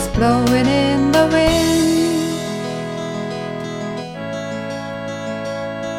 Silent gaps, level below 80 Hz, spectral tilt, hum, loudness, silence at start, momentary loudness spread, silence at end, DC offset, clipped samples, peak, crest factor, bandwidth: none; -36 dBFS; -5 dB/octave; none; -19 LUFS; 0 s; 12 LU; 0 s; under 0.1%; under 0.1%; 0 dBFS; 18 dB; 17 kHz